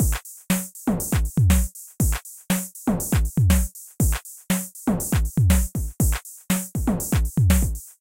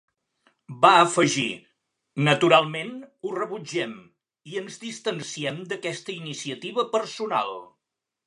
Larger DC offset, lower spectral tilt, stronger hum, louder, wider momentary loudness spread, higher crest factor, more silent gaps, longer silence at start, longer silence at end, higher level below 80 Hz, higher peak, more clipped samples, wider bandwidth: neither; about the same, -5 dB/octave vs -4 dB/octave; neither; about the same, -23 LUFS vs -24 LUFS; second, 7 LU vs 18 LU; second, 16 dB vs 24 dB; neither; second, 0 s vs 0.7 s; second, 0.1 s vs 0.65 s; first, -26 dBFS vs -76 dBFS; second, -6 dBFS vs -2 dBFS; neither; first, 17 kHz vs 11 kHz